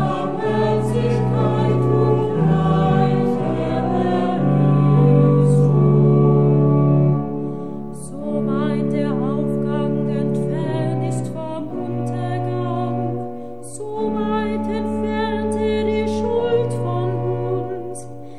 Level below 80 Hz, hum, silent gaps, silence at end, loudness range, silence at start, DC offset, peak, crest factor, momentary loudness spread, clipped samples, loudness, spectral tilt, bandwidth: -44 dBFS; none; none; 0 s; 8 LU; 0 s; 2%; -4 dBFS; 14 dB; 12 LU; under 0.1%; -19 LUFS; -8.5 dB/octave; 10.5 kHz